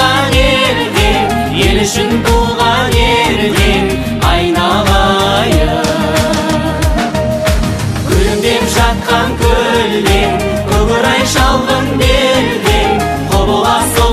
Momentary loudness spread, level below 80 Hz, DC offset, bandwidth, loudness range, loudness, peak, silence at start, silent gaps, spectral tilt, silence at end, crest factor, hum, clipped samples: 4 LU; -18 dBFS; under 0.1%; 15.5 kHz; 2 LU; -11 LUFS; 0 dBFS; 0 s; none; -4.5 dB/octave; 0 s; 10 dB; none; under 0.1%